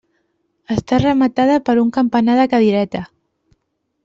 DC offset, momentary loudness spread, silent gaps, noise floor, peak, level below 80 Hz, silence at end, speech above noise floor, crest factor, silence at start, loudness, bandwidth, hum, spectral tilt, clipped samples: under 0.1%; 9 LU; none; -71 dBFS; -2 dBFS; -48 dBFS; 1 s; 56 dB; 14 dB; 0.7 s; -15 LUFS; 7.6 kHz; none; -7 dB/octave; under 0.1%